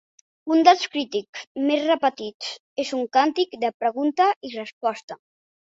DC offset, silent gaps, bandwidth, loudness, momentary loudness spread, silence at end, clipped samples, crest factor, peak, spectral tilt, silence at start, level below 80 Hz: under 0.1%; 1.29-1.33 s, 1.47-1.55 s, 2.34-2.40 s, 2.60-2.76 s, 3.74-3.80 s, 4.36-4.41 s, 4.73-4.81 s, 5.03-5.08 s; 7.8 kHz; -22 LUFS; 16 LU; 0.65 s; under 0.1%; 22 dB; 0 dBFS; -3 dB/octave; 0.45 s; -74 dBFS